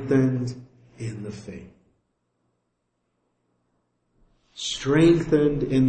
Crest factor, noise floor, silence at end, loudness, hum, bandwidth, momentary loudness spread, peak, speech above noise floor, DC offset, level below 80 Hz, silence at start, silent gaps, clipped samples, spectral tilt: 18 dB; -76 dBFS; 0 s; -22 LUFS; none; 8.8 kHz; 22 LU; -8 dBFS; 54 dB; under 0.1%; -50 dBFS; 0 s; none; under 0.1%; -6.5 dB/octave